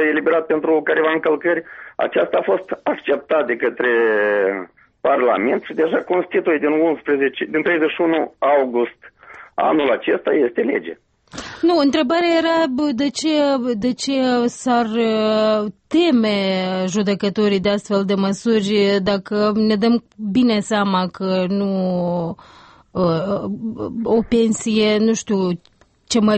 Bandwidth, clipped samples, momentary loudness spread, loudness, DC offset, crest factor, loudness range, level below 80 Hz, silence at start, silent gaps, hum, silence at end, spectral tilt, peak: 8.8 kHz; under 0.1%; 7 LU; -18 LUFS; under 0.1%; 12 dB; 2 LU; -54 dBFS; 0 s; none; none; 0 s; -5.5 dB/octave; -6 dBFS